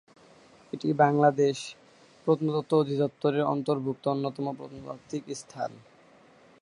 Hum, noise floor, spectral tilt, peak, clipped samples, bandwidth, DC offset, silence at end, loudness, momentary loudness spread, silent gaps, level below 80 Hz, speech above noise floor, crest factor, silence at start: none; -57 dBFS; -6.5 dB/octave; -8 dBFS; under 0.1%; 11 kHz; under 0.1%; 0.85 s; -28 LUFS; 17 LU; none; -72 dBFS; 30 dB; 22 dB; 0.75 s